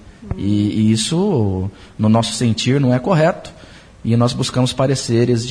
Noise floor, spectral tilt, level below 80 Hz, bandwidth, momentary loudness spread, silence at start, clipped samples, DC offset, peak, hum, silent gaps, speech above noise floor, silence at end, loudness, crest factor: -36 dBFS; -6 dB/octave; -42 dBFS; 10.5 kHz; 10 LU; 0.05 s; under 0.1%; under 0.1%; -4 dBFS; none; none; 20 dB; 0 s; -17 LUFS; 14 dB